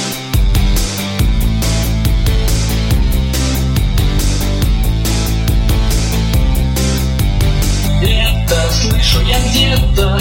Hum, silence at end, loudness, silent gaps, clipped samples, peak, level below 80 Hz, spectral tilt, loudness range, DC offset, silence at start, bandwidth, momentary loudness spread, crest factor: none; 0 s; -14 LUFS; none; under 0.1%; 0 dBFS; -14 dBFS; -4.5 dB/octave; 2 LU; under 0.1%; 0 s; 17 kHz; 4 LU; 12 dB